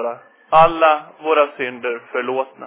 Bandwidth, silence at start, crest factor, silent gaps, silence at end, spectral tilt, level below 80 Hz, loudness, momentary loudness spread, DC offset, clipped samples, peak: 4 kHz; 0 s; 16 dB; none; 0 s; -8 dB/octave; -52 dBFS; -17 LUFS; 12 LU; under 0.1%; under 0.1%; -2 dBFS